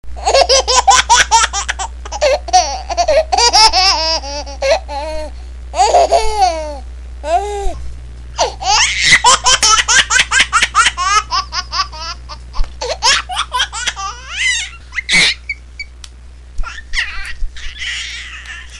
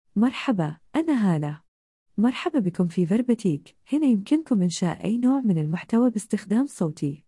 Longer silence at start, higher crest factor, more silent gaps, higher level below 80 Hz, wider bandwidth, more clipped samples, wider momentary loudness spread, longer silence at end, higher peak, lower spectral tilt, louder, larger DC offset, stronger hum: about the same, 0.05 s vs 0.15 s; about the same, 14 dB vs 14 dB; second, none vs 1.68-2.06 s; first, -28 dBFS vs -66 dBFS; first, 16 kHz vs 12 kHz; neither; first, 20 LU vs 6 LU; about the same, 0 s vs 0.1 s; first, 0 dBFS vs -10 dBFS; second, -0.5 dB/octave vs -7 dB/octave; first, -12 LUFS vs -24 LUFS; first, 0.7% vs under 0.1%; neither